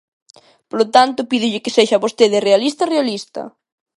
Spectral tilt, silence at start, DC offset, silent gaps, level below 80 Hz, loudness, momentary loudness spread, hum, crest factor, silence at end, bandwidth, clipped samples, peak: -3.5 dB/octave; 0.75 s; under 0.1%; none; -66 dBFS; -15 LUFS; 14 LU; none; 16 dB; 0.5 s; 11.5 kHz; under 0.1%; 0 dBFS